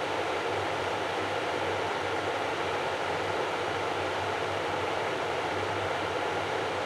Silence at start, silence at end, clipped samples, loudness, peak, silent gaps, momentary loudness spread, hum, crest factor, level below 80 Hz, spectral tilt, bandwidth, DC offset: 0 s; 0 s; under 0.1%; -30 LUFS; -18 dBFS; none; 0 LU; none; 12 dB; -62 dBFS; -4 dB/octave; 16 kHz; under 0.1%